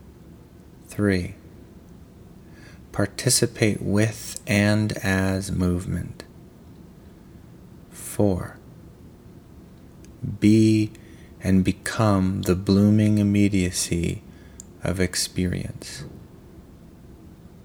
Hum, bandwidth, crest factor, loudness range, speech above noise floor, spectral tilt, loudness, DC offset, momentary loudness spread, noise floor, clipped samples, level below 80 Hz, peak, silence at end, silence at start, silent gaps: none; 19.5 kHz; 22 dB; 10 LU; 25 dB; -5.5 dB/octave; -22 LUFS; under 0.1%; 19 LU; -47 dBFS; under 0.1%; -48 dBFS; -4 dBFS; 0.3 s; 0.05 s; none